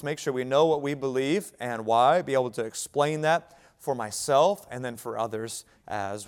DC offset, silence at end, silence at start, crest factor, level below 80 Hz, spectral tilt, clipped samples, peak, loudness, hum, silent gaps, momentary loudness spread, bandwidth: under 0.1%; 0 s; 0 s; 18 dB; -68 dBFS; -4.5 dB/octave; under 0.1%; -8 dBFS; -27 LUFS; none; none; 12 LU; 17.5 kHz